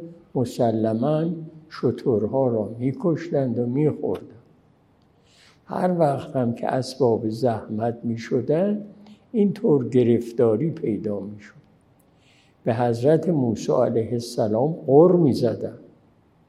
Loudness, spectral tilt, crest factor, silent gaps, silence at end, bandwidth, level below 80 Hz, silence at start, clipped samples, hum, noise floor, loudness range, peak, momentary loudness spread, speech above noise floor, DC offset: -22 LUFS; -8 dB/octave; 20 dB; none; 0.65 s; 13.5 kHz; -66 dBFS; 0 s; under 0.1%; none; -59 dBFS; 6 LU; -2 dBFS; 10 LU; 37 dB; under 0.1%